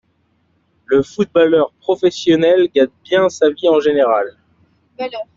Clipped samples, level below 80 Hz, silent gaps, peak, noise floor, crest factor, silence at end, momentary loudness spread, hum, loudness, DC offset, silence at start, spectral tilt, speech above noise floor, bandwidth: under 0.1%; -56 dBFS; none; -2 dBFS; -61 dBFS; 14 dB; 0.15 s; 7 LU; none; -15 LUFS; under 0.1%; 0.9 s; -5.5 dB/octave; 47 dB; 7.6 kHz